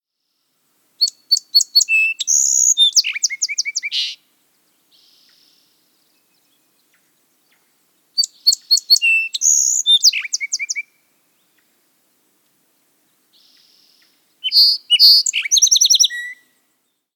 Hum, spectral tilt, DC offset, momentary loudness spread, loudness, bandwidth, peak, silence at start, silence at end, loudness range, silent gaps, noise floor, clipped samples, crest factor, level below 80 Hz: none; 8.5 dB/octave; under 0.1%; 11 LU; -13 LUFS; over 20 kHz; -2 dBFS; 1 s; 0.8 s; 16 LU; none; -71 dBFS; under 0.1%; 18 dB; under -90 dBFS